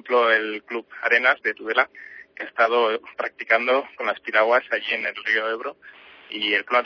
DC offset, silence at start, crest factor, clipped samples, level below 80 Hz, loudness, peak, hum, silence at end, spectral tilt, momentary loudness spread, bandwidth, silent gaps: under 0.1%; 0.05 s; 20 dB; under 0.1%; -72 dBFS; -22 LUFS; -4 dBFS; none; 0 s; -3 dB/octave; 14 LU; 5.4 kHz; none